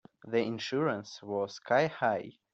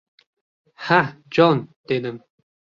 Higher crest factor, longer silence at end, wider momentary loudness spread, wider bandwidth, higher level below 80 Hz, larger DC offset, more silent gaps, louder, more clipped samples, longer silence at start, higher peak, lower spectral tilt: about the same, 18 dB vs 20 dB; second, 0.2 s vs 0.6 s; second, 8 LU vs 16 LU; about the same, 7.8 kHz vs 7.2 kHz; second, -74 dBFS vs -64 dBFS; neither; second, none vs 1.76-1.84 s; second, -32 LUFS vs -20 LUFS; neither; second, 0.25 s vs 0.8 s; second, -14 dBFS vs -2 dBFS; second, -5.5 dB/octave vs -7 dB/octave